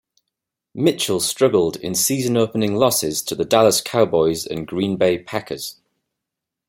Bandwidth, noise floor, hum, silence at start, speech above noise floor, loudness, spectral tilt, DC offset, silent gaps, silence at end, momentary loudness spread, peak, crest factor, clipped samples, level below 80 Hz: 16.5 kHz; -83 dBFS; none; 0.75 s; 64 dB; -19 LUFS; -4 dB/octave; under 0.1%; none; 0.95 s; 10 LU; -2 dBFS; 18 dB; under 0.1%; -56 dBFS